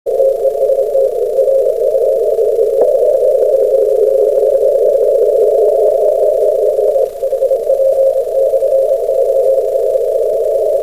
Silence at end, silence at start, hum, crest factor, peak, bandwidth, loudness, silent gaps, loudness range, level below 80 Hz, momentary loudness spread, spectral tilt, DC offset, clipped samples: 0 s; 0.05 s; none; 10 dB; -2 dBFS; 15.5 kHz; -12 LUFS; none; 2 LU; -48 dBFS; 3 LU; -5 dB/octave; 0.8%; under 0.1%